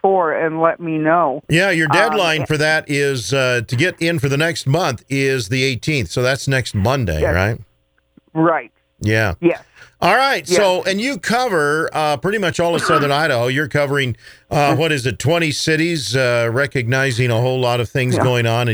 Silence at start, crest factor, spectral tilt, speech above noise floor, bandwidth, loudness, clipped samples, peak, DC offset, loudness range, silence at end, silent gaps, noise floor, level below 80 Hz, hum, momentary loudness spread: 0.05 s; 16 dB; -5 dB/octave; 39 dB; over 20 kHz; -17 LUFS; under 0.1%; 0 dBFS; under 0.1%; 3 LU; 0 s; none; -56 dBFS; -42 dBFS; none; 4 LU